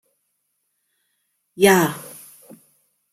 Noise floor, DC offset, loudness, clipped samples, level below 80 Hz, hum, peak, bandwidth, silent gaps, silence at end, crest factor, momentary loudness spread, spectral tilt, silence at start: -73 dBFS; under 0.1%; -17 LUFS; under 0.1%; -66 dBFS; none; -2 dBFS; 16 kHz; none; 1.05 s; 22 dB; 26 LU; -4.5 dB/octave; 1.6 s